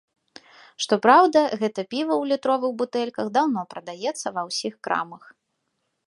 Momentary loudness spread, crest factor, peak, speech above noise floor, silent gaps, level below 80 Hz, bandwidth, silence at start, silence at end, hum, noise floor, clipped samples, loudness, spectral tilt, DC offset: 14 LU; 22 dB; -2 dBFS; 53 dB; none; -76 dBFS; 11.5 kHz; 0.8 s; 0.9 s; none; -76 dBFS; under 0.1%; -23 LUFS; -4 dB/octave; under 0.1%